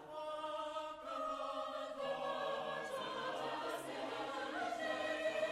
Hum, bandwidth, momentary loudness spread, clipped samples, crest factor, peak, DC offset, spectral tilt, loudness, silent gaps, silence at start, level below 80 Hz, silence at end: none; 13 kHz; 5 LU; under 0.1%; 16 dB; -28 dBFS; under 0.1%; -3 dB/octave; -42 LUFS; none; 0 s; -76 dBFS; 0 s